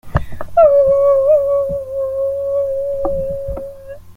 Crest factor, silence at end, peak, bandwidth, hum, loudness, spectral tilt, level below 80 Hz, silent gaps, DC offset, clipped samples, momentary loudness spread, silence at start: 14 dB; 0.05 s; -2 dBFS; 3.8 kHz; none; -15 LUFS; -8.5 dB/octave; -34 dBFS; none; under 0.1%; under 0.1%; 14 LU; 0.05 s